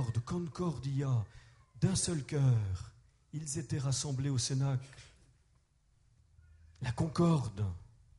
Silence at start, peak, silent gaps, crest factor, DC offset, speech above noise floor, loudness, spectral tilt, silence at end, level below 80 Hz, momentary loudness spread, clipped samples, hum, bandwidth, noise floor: 0 s; -18 dBFS; none; 18 dB; under 0.1%; 37 dB; -34 LUFS; -5.5 dB/octave; 0.35 s; -58 dBFS; 13 LU; under 0.1%; none; 11.5 kHz; -70 dBFS